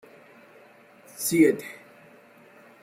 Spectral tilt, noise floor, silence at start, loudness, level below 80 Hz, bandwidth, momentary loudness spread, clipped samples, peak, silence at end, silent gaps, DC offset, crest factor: -4.5 dB/octave; -53 dBFS; 1.2 s; -23 LUFS; -70 dBFS; 16.5 kHz; 26 LU; under 0.1%; -8 dBFS; 1.1 s; none; under 0.1%; 22 dB